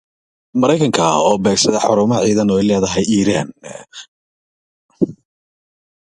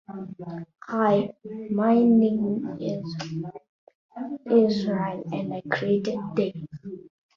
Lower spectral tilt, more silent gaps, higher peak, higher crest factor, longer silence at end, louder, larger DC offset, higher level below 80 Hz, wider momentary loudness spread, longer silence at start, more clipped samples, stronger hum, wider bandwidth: second, -4.5 dB/octave vs -8 dB/octave; first, 4.08-4.89 s vs 3.69-3.87 s, 3.95-4.09 s; first, 0 dBFS vs -8 dBFS; about the same, 16 dB vs 18 dB; first, 0.9 s vs 0.3 s; first, -15 LUFS vs -25 LUFS; neither; first, -48 dBFS vs -66 dBFS; second, 15 LU vs 19 LU; first, 0.55 s vs 0.1 s; neither; neither; first, 11.5 kHz vs 7 kHz